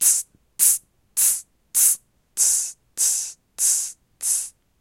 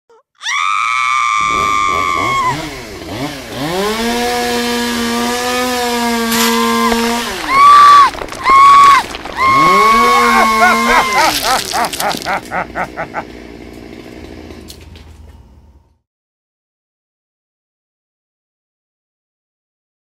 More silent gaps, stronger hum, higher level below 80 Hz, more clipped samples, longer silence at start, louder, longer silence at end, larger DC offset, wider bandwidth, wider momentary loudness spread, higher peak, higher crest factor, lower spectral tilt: neither; neither; second, -68 dBFS vs -40 dBFS; neither; second, 0 s vs 0.4 s; second, -19 LUFS vs -11 LUFS; second, 0.3 s vs 4.75 s; neither; about the same, 16.5 kHz vs 16 kHz; second, 13 LU vs 18 LU; about the same, -2 dBFS vs 0 dBFS; first, 22 dB vs 14 dB; second, 4 dB/octave vs -2.5 dB/octave